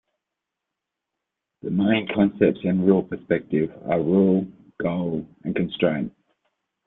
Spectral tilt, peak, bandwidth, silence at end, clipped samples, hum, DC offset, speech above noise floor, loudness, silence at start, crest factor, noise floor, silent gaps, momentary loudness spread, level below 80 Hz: -11.5 dB/octave; -4 dBFS; 3.9 kHz; 0.75 s; under 0.1%; none; under 0.1%; 62 dB; -23 LUFS; 1.65 s; 20 dB; -84 dBFS; none; 10 LU; -60 dBFS